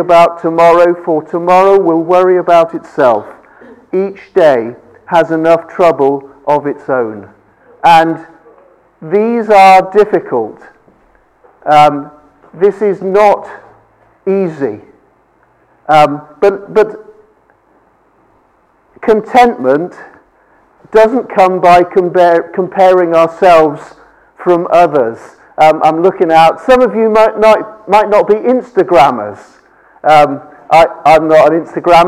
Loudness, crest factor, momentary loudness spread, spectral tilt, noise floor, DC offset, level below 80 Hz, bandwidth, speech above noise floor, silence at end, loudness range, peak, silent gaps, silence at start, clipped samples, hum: -9 LUFS; 10 dB; 11 LU; -6 dB/octave; -51 dBFS; under 0.1%; -46 dBFS; 15 kHz; 43 dB; 0 s; 6 LU; 0 dBFS; none; 0 s; under 0.1%; none